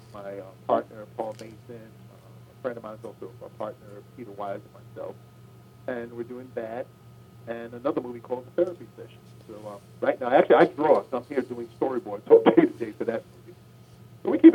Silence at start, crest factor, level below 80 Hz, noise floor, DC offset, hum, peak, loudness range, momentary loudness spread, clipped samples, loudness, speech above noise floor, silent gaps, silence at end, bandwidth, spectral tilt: 0.15 s; 24 dB; -68 dBFS; -50 dBFS; under 0.1%; none; -2 dBFS; 17 LU; 24 LU; under 0.1%; -26 LUFS; 25 dB; none; 0 s; 9.4 kHz; -7.5 dB/octave